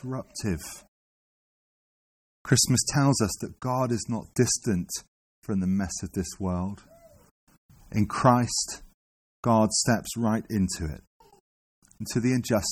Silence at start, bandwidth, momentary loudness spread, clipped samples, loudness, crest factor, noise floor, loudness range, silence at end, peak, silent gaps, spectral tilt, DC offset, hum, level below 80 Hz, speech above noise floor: 0.05 s; 16 kHz; 14 LU; under 0.1%; -26 LUFS; 20 dB; under -90 dBFS; 4 LU; 0 s; -8 dBFS; 0.88-2.45 s, 5.08-5.42 s, 7.31-7.47 s, 7.58-7.69 s, 8.94-9.43 s, 11.07-11.20 s, 11.40-11.82 s; -4.5 dB/octave; under 0.1%; none; -50 dBFS; over 64 dB